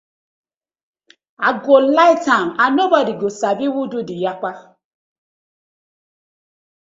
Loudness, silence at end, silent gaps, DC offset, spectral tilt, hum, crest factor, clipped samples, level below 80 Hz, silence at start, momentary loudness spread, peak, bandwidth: -16 LUFS; 2.25 s; none; under 0.1%; -4.5 dB/octave; none; 18 dB; under 0.1%; -66 dBFS; 1.4 s; 11 LU; 0 dBFS; 7.8 kHz